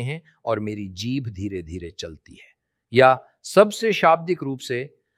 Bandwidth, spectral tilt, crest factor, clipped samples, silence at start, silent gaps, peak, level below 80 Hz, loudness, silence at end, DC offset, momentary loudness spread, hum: 15.5 kHz; -5.5 dB/octave; 20 dB; under 0.1%; 0 s; none; -2 dBFS; -54 dBFS; -21 LUFS; 0.3 s; under 0.1%; 16 LU; none